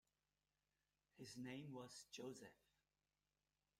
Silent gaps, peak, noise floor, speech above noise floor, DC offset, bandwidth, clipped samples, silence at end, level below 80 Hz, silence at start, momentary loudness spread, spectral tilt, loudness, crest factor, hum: none; -44 dBFS; under -90 dBFS; over 33 dB; under 0.1%; 16 kHz; under 0.1%; 1.25 s; under -90 dBFS; 1.15 s; 8 LU; -4.5 dB/octave; -57 LUFS; 18 dB; none